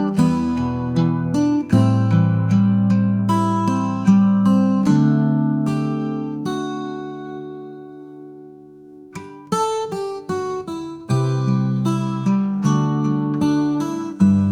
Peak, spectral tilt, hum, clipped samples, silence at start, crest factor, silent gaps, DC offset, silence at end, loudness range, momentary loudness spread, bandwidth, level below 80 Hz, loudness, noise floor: -4 dBFS; -8 dB/octave; none; under 0.1%; 0 s; 16 dB; none; under 0.1%; 0 s; 12 LU; 16 LU; 10.5 kHz; -54 dBFS; -19 LUFS; -42 dBFS